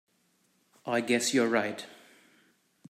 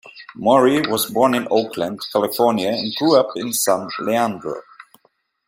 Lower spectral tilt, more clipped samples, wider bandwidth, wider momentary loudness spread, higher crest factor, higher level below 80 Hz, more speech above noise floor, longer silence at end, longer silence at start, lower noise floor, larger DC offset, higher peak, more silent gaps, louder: about the same, -3 dB/octave vs -4 dB/octave; neither; about the same, 15.5 kHz vs 16 kHz; first, 18 LU vs 10 LU; about the same, 20 dB vs 18 dB; second, -80 dBFS vs -62 dBFS; about the same, 43 dB vs 45 dB; first, 0.95 s vs 0.65 s; first, 0.85 s vs 0.05 s; first, -71 dBFS vs -63 dBFS; neither; second, -12 dBFS vs -2 dBFS; neither; second, -28 LUFS vs -18 LUFS